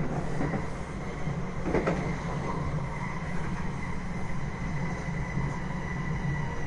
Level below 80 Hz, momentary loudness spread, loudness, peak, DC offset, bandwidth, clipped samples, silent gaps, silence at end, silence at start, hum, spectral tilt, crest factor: -40 dBFS; 5 LU; -33 LUFS; -14 dBFS; under 0.1%; 11 kHz; under 0.1%; none; 0 s; 0 s; none; -7 dB/octave; 16 dB